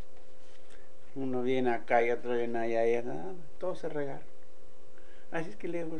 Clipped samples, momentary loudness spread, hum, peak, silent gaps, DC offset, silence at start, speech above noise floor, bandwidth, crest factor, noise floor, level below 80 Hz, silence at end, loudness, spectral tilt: under 0.1%; 13 LU; none; -14 dBFS; none; 3%; 0.1 s; 25 dB; 10 kHz; 22 dB; -57 dBFS; -66 dBFS; 0 s; -33 LUFS; -6.5 dB/octave